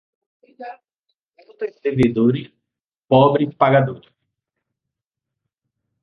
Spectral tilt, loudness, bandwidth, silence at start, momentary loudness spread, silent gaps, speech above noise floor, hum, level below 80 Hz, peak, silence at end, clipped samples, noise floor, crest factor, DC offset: -9 dB/octave; -17 LUFS; 6.4 kHz; 0.6 s; 22 LU; 0.95-1.03 s, 1.15-1.32 s, 2.81-2.90 s; 66 dB; none; -54 dBFS; -2 dBFS; 2.05 s; under 0.1%; -84 dBFS; 20 dB; under 0.1%